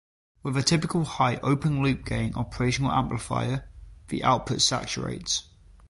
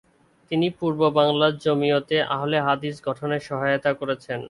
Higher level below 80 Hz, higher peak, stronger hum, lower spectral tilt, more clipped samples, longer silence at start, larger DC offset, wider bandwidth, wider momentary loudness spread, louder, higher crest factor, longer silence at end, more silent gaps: first, -46 dBFS vs -62 dBFS; second, -8 dBFS vs -4 dBFS; neither; second, -4.5 dB/octave vs -6.5 dB/octave; neither; about the same, 0.45 s vs 0.5 s; neither; about the same, 11.5 kHz vs 11.5 kHz; about the same, 8 LU vs 8 LU; second, -26 LUFS vs -23 LUFS; about the same, 20 dB vs 18 dB; first, 0.45 s vs 0 s; neither